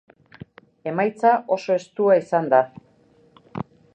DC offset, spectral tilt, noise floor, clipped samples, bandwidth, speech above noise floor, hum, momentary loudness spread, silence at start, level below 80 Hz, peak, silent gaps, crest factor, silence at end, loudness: under 0.1%; -7 dB/octave; -57 dBFS; under 0.1%; 8.8 kHz; 37 dB; none; 16 LU; 0.85 s; -66 dBFS; -4 dBFS; none; 18 dB; 0.35 s; -21 LUFS